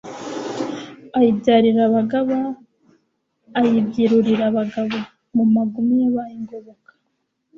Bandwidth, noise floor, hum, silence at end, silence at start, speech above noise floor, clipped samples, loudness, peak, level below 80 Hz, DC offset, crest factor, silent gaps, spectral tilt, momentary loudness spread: 7.4 kHz; -72 dBFS; none; 0.85 s; 0.05 s; 55 dB; under 0.1%; -19 LUFS; -4 dBFS; -60 dBFS; under 0.1%; 16 dB; none; -7 dB/octave; 16 LU